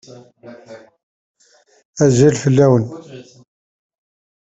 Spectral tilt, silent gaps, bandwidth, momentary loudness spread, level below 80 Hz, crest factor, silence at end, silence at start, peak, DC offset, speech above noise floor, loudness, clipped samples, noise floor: -7 dB/octave; 1.03-1.35 s, 1.85-1.93 s; 8.2 kHz; 24 LU; -52 dBFS; 18 dB; 1.2 s; 0.45 s; 0 dBFS; under 0.1%; 40 dB; -14 LUFS; under 0.1%; -55 dBFS